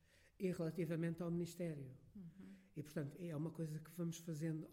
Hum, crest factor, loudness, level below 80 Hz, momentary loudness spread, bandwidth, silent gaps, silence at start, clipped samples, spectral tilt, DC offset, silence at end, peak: none; 16 dB; -46 LUFS; -76 dBFS; 14 LU; 16.5 kHz; none; 0.15 s; under 0.1%; -7 dB/octave; under 0.1%; 0 s; -30 dBFS